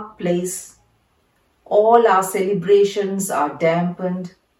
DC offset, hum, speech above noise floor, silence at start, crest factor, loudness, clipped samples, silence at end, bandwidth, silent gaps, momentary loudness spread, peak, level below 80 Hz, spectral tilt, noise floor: under 0.1%; none; 45 dB; 0 s; 18 dB; -18 LUFS; under 0.1%; 0.3 s; 16.5 kHz; none; 12 LU; 0 dBFS; -64 dBFS; -5 dB/octave; -62 dBFS